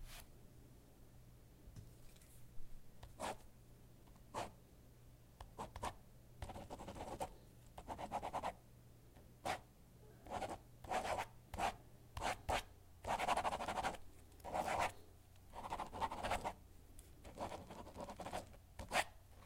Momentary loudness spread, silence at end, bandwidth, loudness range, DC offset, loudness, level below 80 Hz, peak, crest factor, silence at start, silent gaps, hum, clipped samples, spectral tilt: 23 LU; 0 s; 16 kHz; 11 LU; under 0.1%; -46 LUFS; -60 dBFS; -22 dBFS; 26 dB; 0 s; none; none; under 0.1%; -3.5 dB/octave